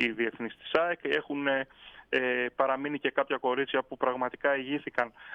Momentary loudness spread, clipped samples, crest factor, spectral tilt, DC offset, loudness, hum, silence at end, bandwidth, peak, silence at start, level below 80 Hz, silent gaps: 4 LU; under 0.1%; 20 dB; -6 dB/octave; under 0.1%; -30 LUFS; none; 0 s; 7.6 kHz; -10 dBFS; 0 s; -70 dBFS; none